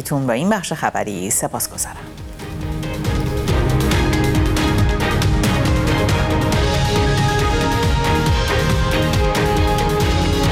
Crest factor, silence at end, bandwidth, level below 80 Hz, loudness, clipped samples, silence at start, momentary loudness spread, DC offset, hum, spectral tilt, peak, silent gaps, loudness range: 16 dB; 0 s; 18 kHz; -24 dBFS; -18 LUFS; under 0.1%; 0 s; 6 LU; under 0.1%; none; -5 dB/octave; -2 dBFS; none; 4 LU